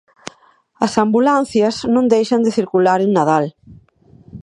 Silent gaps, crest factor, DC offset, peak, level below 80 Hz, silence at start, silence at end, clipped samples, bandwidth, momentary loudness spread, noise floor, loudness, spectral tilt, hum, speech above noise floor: none; 16 dB; under 0.1%; 0 dBFS; -54 dBFS; 0.8 s; 0.05 s; under 0.1%; 11 kHz; 11 LU; -53 dBFS; -15 LUFS; -6 dB/octave; none; 38 dB